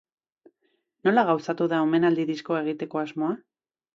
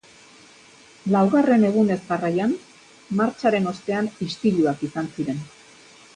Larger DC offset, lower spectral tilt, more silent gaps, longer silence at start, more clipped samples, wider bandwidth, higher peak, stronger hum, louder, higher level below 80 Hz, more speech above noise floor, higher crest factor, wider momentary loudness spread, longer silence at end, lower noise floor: neither; about the same, -7 dB/octave vs -7 dB/octave; neither; about the same, 1.05 s vs 1.05 s; neither; second, 7.4 kHz vs 10 kHz; about the same, -6 dBFS vs -6 dBFS; neither; second, -25 LUFS vs -22 LUFS; second, -74 dBFS vs -64 dBFS; first, 49 dB vs 29 dB; about the same, 20 dB vs 16 dB; second, 8 LU vs 11 LU; about the same, 0.6 s vs 0.7 s; first, -73 dBFS vs -50 dBFS